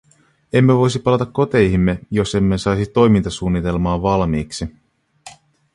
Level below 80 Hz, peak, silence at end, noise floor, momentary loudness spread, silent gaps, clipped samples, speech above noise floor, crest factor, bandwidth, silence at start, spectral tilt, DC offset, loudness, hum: -34 dBFS; -2 dBFS; 0.45 s; -44 dBFS; 7 LU; none; under 0.1%; 28 dB; 16 dB; 11.5 kHz; 0.55 s; -7 dB/octave; under 0.1%; -17 LUFS; none